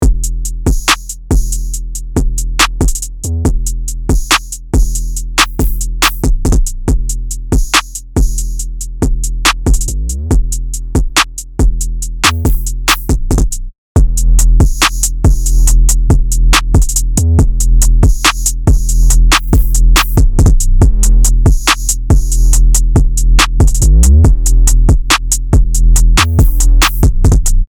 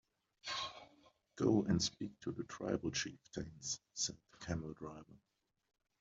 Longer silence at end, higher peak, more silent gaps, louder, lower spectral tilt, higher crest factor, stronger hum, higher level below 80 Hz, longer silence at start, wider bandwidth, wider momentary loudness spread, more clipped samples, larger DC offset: second, 0.05 s vs 0.85 s; first, 0 dBFS vs -20 dBFS; first, 13.78-13.95 s vs none; first, -12 LUFS vs -40 LUFS; about the same, -3.5 dB/octave vs -4 dB/octave; second, 8 dB vs 22 dB; neither; first, -10 dBFS vs -66 dBFS; second, 0 s vs 0.45 s; first, over 20 kHz vs 8 kHz; second, 8 LU vs 17 LU; neither; neither